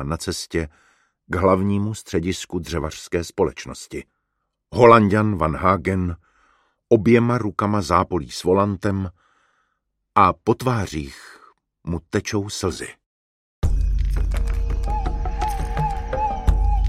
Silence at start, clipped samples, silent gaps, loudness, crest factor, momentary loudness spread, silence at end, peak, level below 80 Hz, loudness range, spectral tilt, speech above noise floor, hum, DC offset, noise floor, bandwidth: 0 s; under 0.1%; 13.06-13.62 s; -21 LUFS; 20 dB; 14 LU; 0 s; 0 dBFS; -28 dBFS; 7 LU; -6.5 dB/octave; 56 dB; none; under 0.1%; -76 dBFS; 14.5 kHz